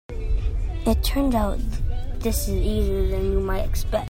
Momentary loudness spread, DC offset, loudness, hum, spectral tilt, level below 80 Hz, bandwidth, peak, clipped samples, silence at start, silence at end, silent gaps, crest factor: 7 LU; under 0.1%; -25 LUFS; none; -6 dB/octave; -24 dBFS; 16.5 kHz; -8 dBFS; under 0.1%; 0.1 s; 0 s; none; 14 dB